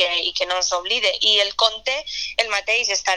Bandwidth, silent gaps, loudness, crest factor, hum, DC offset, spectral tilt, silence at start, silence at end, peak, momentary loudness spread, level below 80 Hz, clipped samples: 12.5 kHz; none; -19 LUFS; 20 dB; none; 0.2%; 2 dB/octave; 0 s; 0 s; 0 dBFS; 8 LU; -54 dBFS; under 0.1%